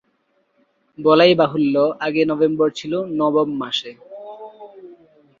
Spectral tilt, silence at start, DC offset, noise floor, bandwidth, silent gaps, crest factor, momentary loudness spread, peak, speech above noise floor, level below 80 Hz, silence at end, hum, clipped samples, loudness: -6 dB/octave; 1 s; under 0.1%; -65 dBFS; 7.6 kHz; none; 18 dB; 23 LU; -2 dBFS; 48 dB; -64 dBFS; 0.45 s; none; under 0.1%; -18 LUFS